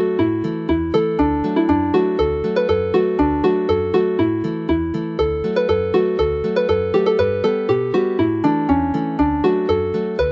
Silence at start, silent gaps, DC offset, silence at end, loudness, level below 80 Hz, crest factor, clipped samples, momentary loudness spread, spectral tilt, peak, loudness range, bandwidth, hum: 0 s; none; under 0.1%; 0 s; -19 LUFS; -34 dBFS; 16 dB; under 0.1%; 4 LU; -8.5 dB/octave; -2 dBFS; 1 LU; 7.2 kHz; none